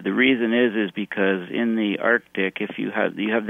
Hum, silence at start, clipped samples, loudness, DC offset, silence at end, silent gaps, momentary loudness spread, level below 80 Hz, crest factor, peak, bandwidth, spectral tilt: none; 0 s; under 0.1%; -22 LUFS; under 0.1%; 0 s; none; 7 LU; -70 dBFS; 18 dB; -4 dBFS; 3.8 kHz; -7.5 dB/octave